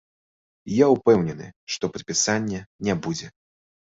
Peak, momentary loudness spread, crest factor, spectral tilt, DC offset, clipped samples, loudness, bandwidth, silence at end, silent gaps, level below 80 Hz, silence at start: -4 dBFS; 14 LU; 20 dB; -4.5 dB/octave; under 0.1%; under 0.1%; -23 LUFS; 7.8 kHz; 0.65 s; 1.56-1.67 s, 2.66-2.79 s; -56 dBFS; 0.65 s